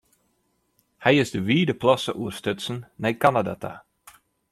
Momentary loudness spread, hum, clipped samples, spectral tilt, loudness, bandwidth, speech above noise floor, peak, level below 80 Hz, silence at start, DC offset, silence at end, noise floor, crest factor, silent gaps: 12 LU; none; under 0.1%; -5.5 dB/octave; -23 LUFS; 15 kHz; 47 dB; -4 dBFS; -60 dBFS; 1 s; under 0.1%; 0.7 s; -70 dBFS; 22 dB; none